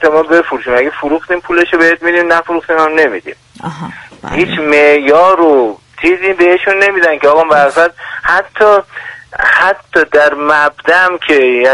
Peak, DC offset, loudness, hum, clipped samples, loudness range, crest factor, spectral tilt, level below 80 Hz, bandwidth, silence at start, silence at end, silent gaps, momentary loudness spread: 0 dBFS; under 0.1%; -9 LUFS; none; 0.3%; 3 LU; 10 dB; -5 dB/octave; -44 dBFS; 11.5 kHz; 0 s; 0 s; none; 14 LU